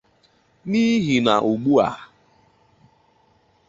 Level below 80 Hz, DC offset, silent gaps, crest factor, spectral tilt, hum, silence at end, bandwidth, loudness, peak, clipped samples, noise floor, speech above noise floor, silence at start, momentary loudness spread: -58 dBFS; under 0.1%; none; 20 dB; -6 dB/octave; none; 1.65 s; 7.8 kHz; -19 LUFS; -2 dBFS; under 0.1%; -60 dBFS; 42 dB; 0.65 s; 12 LU